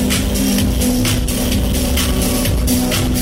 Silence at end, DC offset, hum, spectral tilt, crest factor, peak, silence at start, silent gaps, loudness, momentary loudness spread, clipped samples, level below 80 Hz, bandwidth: 0 s; under 0.1%; none; -4.5 dB/octave; 10 dB; -4 dBFS; 0 s; none; -16 LUFS; 1 LU; under 0.1%; -20 dBFS; 16.5 kHz